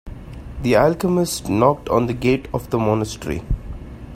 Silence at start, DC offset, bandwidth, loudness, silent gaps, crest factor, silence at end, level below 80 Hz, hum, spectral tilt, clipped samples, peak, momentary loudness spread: 0.05 s; under 0.1%; 16 kHz; -20 LUFS; none; 20 dB; 0 s; -34 dBFS; none; -6 dB/octave; under 0.1%; 0 dBFS; 19 LU